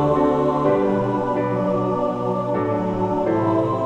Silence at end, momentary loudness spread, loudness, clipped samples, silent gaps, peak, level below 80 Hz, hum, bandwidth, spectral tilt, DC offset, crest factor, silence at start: 0 s; 4 LU; -21 LUFS; under 0.1%; none; -6 dBFS; -46 dBFS; none; 9 kHz; -9 dB/octave; under 0.1%; 14 dB; 0 s